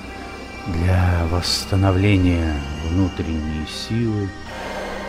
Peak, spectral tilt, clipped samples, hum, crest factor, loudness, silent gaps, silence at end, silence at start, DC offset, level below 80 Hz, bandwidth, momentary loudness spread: -6 dBFS; -6 dB/octave; under 0.1%; none; 14 dB; -21 LUFS; none; 0 s; 0 s; under 0.1%; -32 dBFS; 14 kHz; 13 LU